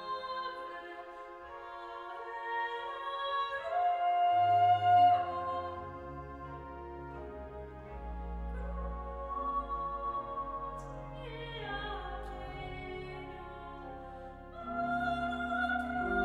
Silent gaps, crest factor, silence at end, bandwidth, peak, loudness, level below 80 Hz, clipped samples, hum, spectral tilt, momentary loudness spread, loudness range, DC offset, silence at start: none; 18 dB; 0 s; 7.6 kHz; -16 dBFS; -35 LUFS; -50 dBFS; under 0.1%; none; -6.5 dB/octave; 19 LU; 13 LU; under 0.1%; 0 s